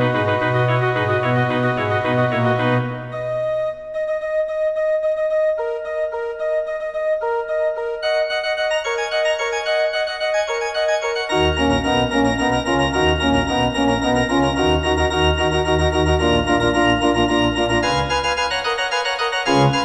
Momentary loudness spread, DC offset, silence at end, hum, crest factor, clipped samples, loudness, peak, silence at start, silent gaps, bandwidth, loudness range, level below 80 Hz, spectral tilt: 6 LU; under 0.1%; 0 s; none; 16 dB; under 0.1%; -19 LUFS; -2 dBFS; 0 s; none; 11.5 kHz; 4 LU; -34 dBFS; -5.5 dB/octave